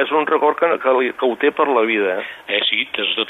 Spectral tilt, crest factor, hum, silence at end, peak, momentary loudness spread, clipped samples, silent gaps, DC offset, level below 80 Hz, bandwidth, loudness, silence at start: -5 dB/octave; 16 dB; none; 0 s; -2 dBFS; 4 LU; under 0.1%; none; under 0.1%; -68 dBFS; 4.2 kHz; -17 LUFS; 0 s